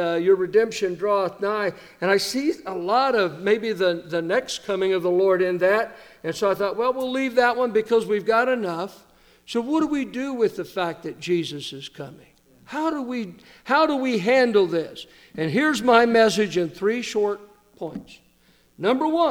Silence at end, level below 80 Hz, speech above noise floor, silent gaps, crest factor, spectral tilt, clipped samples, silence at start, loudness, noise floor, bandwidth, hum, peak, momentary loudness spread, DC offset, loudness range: 0 s; -62 dBFS; 37 dB; none; 20 dB; -4.5 dB/octave; under 0.1%; 0 s; -22 LUFS; -59 dBFS; 18 kHz; none; -2 dBFS; 15 LU; under 0.1%; 6 LU